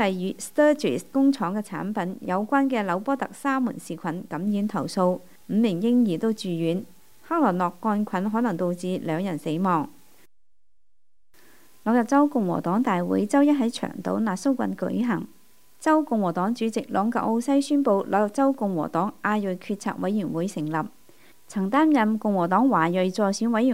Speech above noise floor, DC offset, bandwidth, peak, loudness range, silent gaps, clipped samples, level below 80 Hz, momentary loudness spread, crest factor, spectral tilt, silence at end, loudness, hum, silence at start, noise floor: 55 dB; 0.3%; 16 kHz; -6 dBFS; 3 LU; none; under 0.1%; -70 dBFS; 9 LU; 18 dB; -6.5 dB/octave; 0 s; -24 LUFS; none; 0 s; -79 dBFS